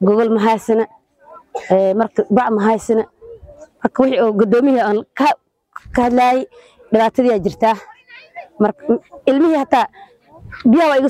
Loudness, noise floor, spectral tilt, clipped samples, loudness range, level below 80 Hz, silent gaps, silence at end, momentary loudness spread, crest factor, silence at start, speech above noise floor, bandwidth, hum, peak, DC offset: -16 LUFS; -44 dBFS; -6.5 dB/octave; under 0.1%; 2 LU; -48 dBFS; none; 0 s; 11 LU; 16 dB; 0 s; 29 dB; 14 kHz; none; 0 dBFS; under 0.1%